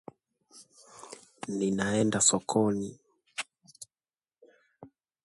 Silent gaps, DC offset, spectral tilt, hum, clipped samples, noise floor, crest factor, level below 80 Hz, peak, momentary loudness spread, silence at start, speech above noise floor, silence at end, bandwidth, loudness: none; under 0.1%; -3.5 dB/octave; none; under 0.1%; under -90 dBFS; 22 dB; -66 dBFS; -10 dBFS; 26 LU; 0.55 s; over 62 dB; 0.4 s; 11.5 kHz; -28 LUFS